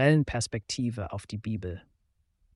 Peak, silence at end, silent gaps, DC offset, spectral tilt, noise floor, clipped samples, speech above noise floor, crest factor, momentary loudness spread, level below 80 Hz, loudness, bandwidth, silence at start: -10 dBFS; 0.75 s; none; under 0.1%; -5.5 dB/octave; -72 dBFS; under 0.1%; 44 dB; 20 dB; 12 LU; -52 dBFS; -31 LUFS; 11.5 kHz; 0 s